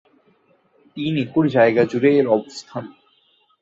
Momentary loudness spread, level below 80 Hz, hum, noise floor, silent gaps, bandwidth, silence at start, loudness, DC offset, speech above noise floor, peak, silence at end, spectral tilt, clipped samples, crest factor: 17 LU; -62 dBFS; none; -61 dBFS; none; 7.8 kHz; 0.95 s; -18 LUFS; under 0.1%; 43 dB; -2 dBFS; 0.75 s; -7 dB/octave; under 0.1%; 18 dB